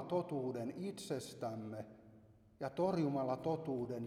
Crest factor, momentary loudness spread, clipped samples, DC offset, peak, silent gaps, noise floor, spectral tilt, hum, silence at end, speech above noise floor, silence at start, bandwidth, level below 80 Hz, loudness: 16 dB; 11 LU; under 0.1%; under 0.1%; -24 dBFS; none; -64 dBFS; -7 dB/octave; none; 0 s; 24 dB; 0 s; 15.5 kHz; -74 dBFS; -41 LUFS